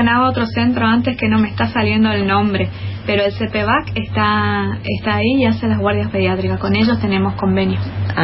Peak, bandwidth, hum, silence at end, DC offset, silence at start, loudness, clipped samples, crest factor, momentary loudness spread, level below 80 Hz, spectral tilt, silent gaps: -2 dBFS; 5.8 kHz; none; 0 s; under 0.1%; 0 s; -16 LUFS; under 0.1%; 14 dB; 5 LU; -40 dBFS; -9.5 dB/octave; none